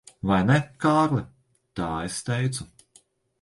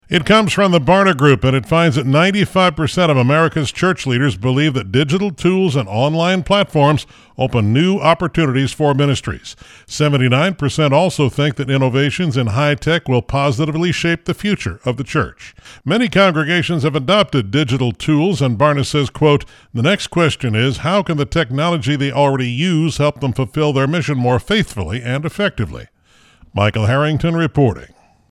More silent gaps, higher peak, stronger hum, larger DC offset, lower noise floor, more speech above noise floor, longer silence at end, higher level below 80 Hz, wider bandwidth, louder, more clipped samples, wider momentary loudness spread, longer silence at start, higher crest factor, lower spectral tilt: neither; second, -6 dBFS vs 0 dBFS; neither; neither; first, -60 dBFS vs -51 dBFS; about the same, 37 dB vs 36 dB; first, 0.75 s vs 0.45 s; second, -50 dBFS vs -40 dBFS; about the same, 11.5 kHz vs 12.5 kHz; second, -25 LUFS vs -15 LUFS; neither; first, 17 LU vs 7 LU; first, 0.25 s vs 0.1 s; about the same, 20 dB vs 16 dB; about the same, -6 dB/octave vs -6 dB/octave